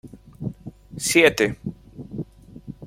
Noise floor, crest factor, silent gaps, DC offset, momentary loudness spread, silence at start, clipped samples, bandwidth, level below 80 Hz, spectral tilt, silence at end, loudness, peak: -41 dBFS; 22 dB; none; under 0.1%; 24 LU; 0.05 s; under 0.1%; 16.5 kHz; -50 dBFS; -3.5 dB/octave; 0 s; -19 LUFS; -2 dBFS